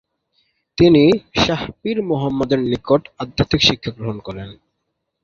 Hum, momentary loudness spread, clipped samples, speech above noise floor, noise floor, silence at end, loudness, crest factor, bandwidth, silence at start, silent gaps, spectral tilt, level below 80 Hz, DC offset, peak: none; 16 LU; under 0.1%; 57 dB; -75 dBFS; 0.7 s; -17 LUFS; 16 dB; 7.4 kHz; 0.8 s; none; -5.5 dB/octave; -42 dBFS; under 0.1%; -2 dBFS